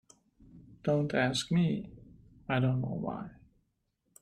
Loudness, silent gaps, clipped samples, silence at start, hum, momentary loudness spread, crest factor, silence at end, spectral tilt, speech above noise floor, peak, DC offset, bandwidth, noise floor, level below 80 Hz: -32 LUFS; none; under 0.1%; 0.55 s; none; 16 LU; 20 dB; 0.9 s; -6 dB/octave; 48 dB; -14 dBFS; under 0.1%; 12.5 kHz; -78 dBFS; -62 dBFS